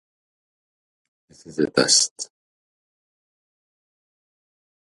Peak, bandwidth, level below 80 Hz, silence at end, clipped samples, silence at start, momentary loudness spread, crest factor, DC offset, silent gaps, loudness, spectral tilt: -2 dBFS; 11.5 kHz; -68 dBFS; 2.65 s; under 0.1%; 1.45 s; 19 LU; 26 dB; under 0.1%; 2.11-2.16 s; -18 LUFS; -1.5 dB/octave